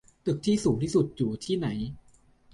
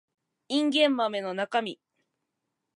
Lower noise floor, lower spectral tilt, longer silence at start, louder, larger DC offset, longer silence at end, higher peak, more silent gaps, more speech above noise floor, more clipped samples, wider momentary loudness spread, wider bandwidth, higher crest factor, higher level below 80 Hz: second, -59 dBFS vs -83 dBFS; first, -6.5 dB/octave vs -4 dB/octave; second, 0.25 s vs 0.5 s; about the same, -28 LUFS vs -27 LUFS; neither; second, 0.55 s vs 1 s; about the same, -12 dBFS vs -10 dBFS; neither; second, 32 dB vs 56 dB; neither; about the same, 8 LU vs 8 LU; about the same, 11.5 kHz vs 11.5 kHz; about the same, 16 dB vs 20 dB; first, -54 dBFS vs -86 dBFS